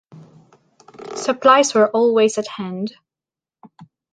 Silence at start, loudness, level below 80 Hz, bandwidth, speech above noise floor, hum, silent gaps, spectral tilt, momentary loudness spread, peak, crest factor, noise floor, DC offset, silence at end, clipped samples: 0.15 s; -17 LUFS; -70 dBFS; 10 kHz; 73 dB; none; none; -3.5 dB/octave; 17 LU; -2 dBFS; 18 dB; -90 dBFS; under 0.1%; 0.3 s; under 0.1%